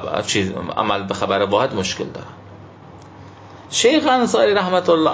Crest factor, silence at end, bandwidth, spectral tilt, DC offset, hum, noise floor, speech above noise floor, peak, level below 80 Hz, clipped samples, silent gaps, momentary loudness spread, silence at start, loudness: 16 dB; 0 s; 8 kHz; -4 dB/octave; under 0.1%; none; -40 dBFS; 23 dB; -2 dBFS; -50 dBFS; under 0.1%; none; 10 LU; 0 s; -18 LUFS